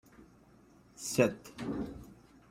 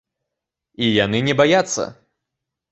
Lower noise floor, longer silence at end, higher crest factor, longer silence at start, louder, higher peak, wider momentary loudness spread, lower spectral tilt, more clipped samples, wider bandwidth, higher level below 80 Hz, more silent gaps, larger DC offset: second, -61 dBFS vs -83 dBFS; second, 0.35 s vs 0.8 s; first, 26 dB vs 20 dB; second, 0.2 s vs 0.8 s; second, -34 LUFS vs -18 LUFS; second, -12 dBFS vs -2 dBFS; first, 19 LU vs 9 LU; about the same, -5 dB/octave vs -4 dB/octave; neither; first, 16 kHz vs 8.2 kHz; second, -60 dBFS vs -54 dBFS; neither; neither